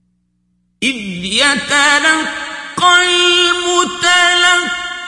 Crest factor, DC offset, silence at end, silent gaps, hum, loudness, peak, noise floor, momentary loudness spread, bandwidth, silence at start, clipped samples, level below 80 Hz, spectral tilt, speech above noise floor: 14 dB; under 0.1%; 0 s; none; 60 Hz at -55 dBFS; -11 LUFS; 0 dBFS; -62 dBFS; 10 LU; 12 kHz; 0.8 s; under 0.1%; -50 dBFS; -1 dB/octave; 50 dB